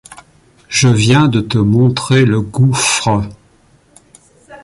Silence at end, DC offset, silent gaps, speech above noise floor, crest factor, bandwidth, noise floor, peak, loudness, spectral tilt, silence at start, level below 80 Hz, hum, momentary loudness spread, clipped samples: 0.05 s; under 0.1%; none; 39 dB; 12 dB; 11.5 kHz; -50 dBFS; 0 dBFS; -12 LUFS; -5 dB/octave; 0.1 s; -40 dBFS; none; 7 LU; under 0.1%